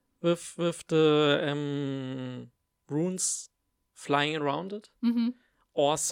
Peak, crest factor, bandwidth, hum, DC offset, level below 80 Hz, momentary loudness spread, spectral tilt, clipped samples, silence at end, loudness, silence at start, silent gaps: -10 dBFS; 20 dB; 16.5 kHz; none; under 0.1%; -76 dBFS; 14 LU; -4 dB/octave; under 0.1%; 0 s; -29 LUFS; 0.25 s; none